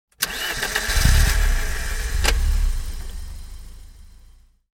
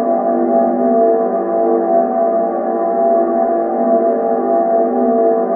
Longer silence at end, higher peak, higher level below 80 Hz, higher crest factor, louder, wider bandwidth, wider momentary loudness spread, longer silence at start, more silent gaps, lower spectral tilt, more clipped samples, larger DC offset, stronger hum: first, 0.65 s vs 0 s; about the same, -2 dBFS vs -2 dBFS; first, -22 dBFS vs -60 dBFS; first, 20 dB vs 12 dB; second, -22 LUFS vs -14 LUFS; first, 17 kHz vs 2.4 kHz; first, 20 LU vs 3 LU; first, 0.2 s vs 0 s; neither; second, -3 dB/octave vs -13.5 dB/octave; neither; neither; neither